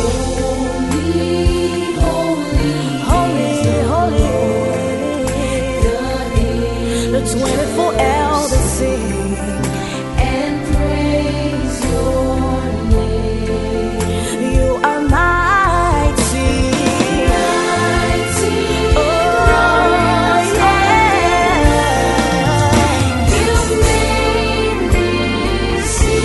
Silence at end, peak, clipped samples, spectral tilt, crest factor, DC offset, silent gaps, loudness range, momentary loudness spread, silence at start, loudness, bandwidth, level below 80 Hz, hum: 0 s; 0 dBFS; under 0.1%; -5 dB/octave; 14 dB; under 0.1%; none; 5 LU; 6 LU; 0 s; -15 LUFS; 12 kHz; -22 dBFS; none